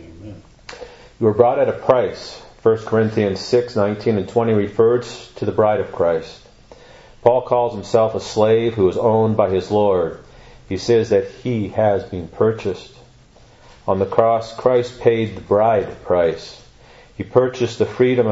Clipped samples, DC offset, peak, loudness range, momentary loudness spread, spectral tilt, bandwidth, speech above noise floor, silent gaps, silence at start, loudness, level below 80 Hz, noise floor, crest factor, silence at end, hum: under 0.1%; under 0.1%; 0 dBFS; 3 LU; 16 LU; -7 dB/octave; 8 kHz; 30 dB; none; 0 s; -18 LUFS; -50 dBFS; -48 dBFS; 18 dB; 0 s; none